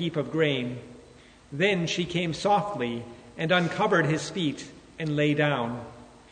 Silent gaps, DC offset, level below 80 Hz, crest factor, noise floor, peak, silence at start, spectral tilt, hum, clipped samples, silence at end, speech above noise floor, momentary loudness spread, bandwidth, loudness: none; under 0.1%; -60 dBFS; 18 dB; -52 dBFS; -8 dBFS; 0 s; -5.5 dB/octave; none; under 0.1%; 0.25 s; 26 dB; 16 LU; 9.6 kHz; -26 LUFS